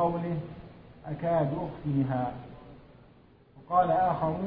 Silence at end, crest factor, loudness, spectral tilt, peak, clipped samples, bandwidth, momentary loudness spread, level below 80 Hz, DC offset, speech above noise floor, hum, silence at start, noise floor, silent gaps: 0 s; 18 dB; -29 LUFS; -11.5 dB/octave; -12 dBFS; under 0.1%; 5 kHz; 22 LU; -54 dBFS; under 0.1%; 29 dB; none; 0 s; -57 dBFS; none